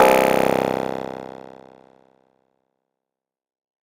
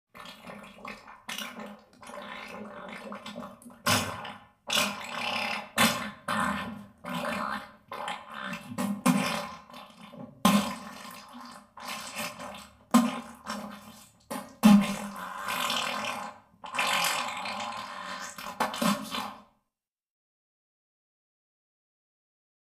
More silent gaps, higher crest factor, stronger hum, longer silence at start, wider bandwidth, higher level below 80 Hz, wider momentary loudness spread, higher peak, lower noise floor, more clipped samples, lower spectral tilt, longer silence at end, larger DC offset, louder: neither; about the same, 22 dB vs 24 dB; neither; second, 0 s vs 0.15 s; about the same, 16.5 kHz vs 15.5 kHz; first, -58 dBFS vs -66 dBFS; about the same, 21 LU vs 20 LU; first, -2 dBFS vs -8 dBFS; about the same, -85 dBFS vs -88 dBFS; neither; about the same, -4.5 dB/octave vs -3.5 dB/octave; second, 2.55 s vs 3.25 s; neither; first, -20 LUFS vs -30 LUFS